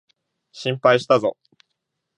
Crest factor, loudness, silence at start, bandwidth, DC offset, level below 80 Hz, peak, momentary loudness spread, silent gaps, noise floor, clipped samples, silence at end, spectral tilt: 20 dB; -20 LUFS; 0.55 s; 10.5 kHz; under 0.1%; -70 dBFS; -2 dBFS; 11 LU; none; -78 dBFS; under 0.1%; 0.85 s; -5.5 dB/octave